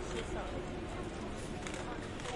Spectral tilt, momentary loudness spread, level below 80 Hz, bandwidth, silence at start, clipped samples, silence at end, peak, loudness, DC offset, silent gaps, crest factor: -5 dB/octave; 2 LU; -48 dBFS; 11.5 kHz; 0 s; under 0.1%; 0 s; -24 dBFS; -42 LUFS; under 0.1%; none; 16 dB